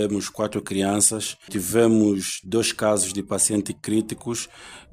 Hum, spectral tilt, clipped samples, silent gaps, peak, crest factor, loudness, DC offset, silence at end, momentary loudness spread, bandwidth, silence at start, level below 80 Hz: none; -3.5 dB/octave; under 0.1%; none; -6 dBFS; 18 dB; -22 LUFS; under 0.1%; 0.1 s; 11 LU; 16 kHz; 0 s; -58 dBFS